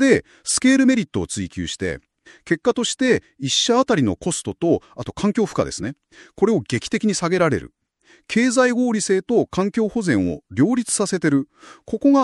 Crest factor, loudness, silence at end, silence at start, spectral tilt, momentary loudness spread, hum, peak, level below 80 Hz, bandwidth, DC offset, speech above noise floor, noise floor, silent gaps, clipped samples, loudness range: 18 dB; -20 LUFS; 0 s; 0 s; -4.5 dB/octave; 10 LU; none; -2 dBFS; -50 dBFS; 12 kHz; under 0.1%; 36 dB; -56 dBFS; none; under 0.1%; 2 LU